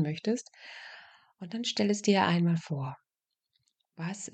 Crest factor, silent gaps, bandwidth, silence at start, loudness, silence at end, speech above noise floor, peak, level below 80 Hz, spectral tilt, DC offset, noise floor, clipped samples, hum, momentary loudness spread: 20 dB; none; 9 kHz; 0 s; -30 LUFS; 0.05 s; 57 dB; -12 dBFS; -80 dBFS; -5.5 dB/octave; under 0.1%; -87 dBFS; under 0.1%; none; 22 LU